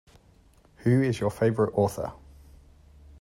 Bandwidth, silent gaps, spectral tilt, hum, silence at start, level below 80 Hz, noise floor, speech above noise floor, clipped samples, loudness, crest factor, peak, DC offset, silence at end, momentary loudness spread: 15.5 kHz; none; -7.5 dB/octave; none; 0.8 s; -54 dBFS; -58 dBFS; 34 dB; under 0.1%; -26 LUFS; 18 dB; -12 dBFS; under 0.1%; 1.05 s; 10 LU